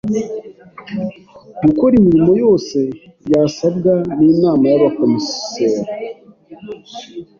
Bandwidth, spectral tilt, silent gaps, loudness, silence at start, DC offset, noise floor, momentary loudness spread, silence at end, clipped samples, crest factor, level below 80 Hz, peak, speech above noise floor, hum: 7.2 kHz; -7 dB/octave; none; -14 LUFS; 0.05 s; under 0.1%; -40 dBFS; 19 LU; 0.15 s; under 0.1%; 14 dB; -48 dBFS; -2 dBFS; 26 dB; none